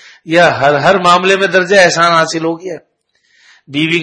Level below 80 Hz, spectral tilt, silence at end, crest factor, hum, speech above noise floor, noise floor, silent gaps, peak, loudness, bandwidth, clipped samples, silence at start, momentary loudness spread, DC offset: -54 dBFS; -4 dB/octave; 0 s; 12 dB; none; 46 dB; -57 dBFS; none; 0 dBFS; -10 LUFS; 11 kHz; 0.3%; 0.25 s; 14 LU; under 0.1%